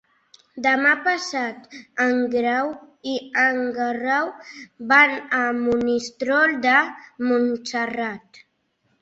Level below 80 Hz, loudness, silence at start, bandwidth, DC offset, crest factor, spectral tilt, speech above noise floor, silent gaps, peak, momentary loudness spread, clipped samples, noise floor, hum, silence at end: -62 dBFS; -21 LUFS; 0.55 s; 8 kHz; under 0.1%; 20 dB; -3.5 dB/octave; 47 dB; none; -2 dBFS; 13 LU; under 0.1%; -68 dBFS; none; 0.85 s